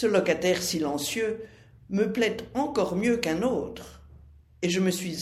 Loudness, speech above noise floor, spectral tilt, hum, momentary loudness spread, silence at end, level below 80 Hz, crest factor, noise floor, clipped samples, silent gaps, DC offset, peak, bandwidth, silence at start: -27 LUFS; 26 dB; -4.5 dB/octave; none; 12 LU; 0 s; -54 dBFS; 18 dB; -52 dBFS; under 0.1%; none; under 0.1%; -10 dBFS; 16 kHz; 0 s